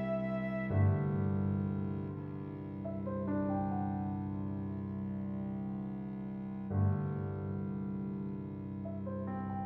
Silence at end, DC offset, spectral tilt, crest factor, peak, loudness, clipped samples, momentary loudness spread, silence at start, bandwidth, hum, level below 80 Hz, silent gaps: 0 s; under 0.1%; -12 dB/octave; 16 dB; -20 dBFS; -37 LUFS; under 0.1%; 8 LU; 0 s; 4 kHz; 50 Hz at -65 dBFS; -60 dBFS; none